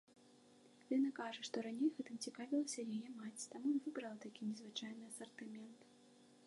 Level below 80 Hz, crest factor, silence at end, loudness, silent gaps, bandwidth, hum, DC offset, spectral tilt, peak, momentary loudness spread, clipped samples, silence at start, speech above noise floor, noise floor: under -90 dBFS; 18 dB; 0 s; -45 LUFS; none; 11.5 kHz; none; under 0.1%; -3.5 dB/octave; -28 dBFS; 13 LU; under 0.1%; 0.1 s; 23 dB; -67 dBFS